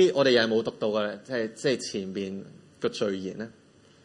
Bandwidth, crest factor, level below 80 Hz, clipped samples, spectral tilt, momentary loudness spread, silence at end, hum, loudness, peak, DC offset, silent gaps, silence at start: 11 kHz; 20 dB; -72 dBFS; under 0.1%; -4.5 dB/octave; 15 LU; 0.55 s; none; -28 LUFS; -8 dBFS; under 0.1%; none; 0 s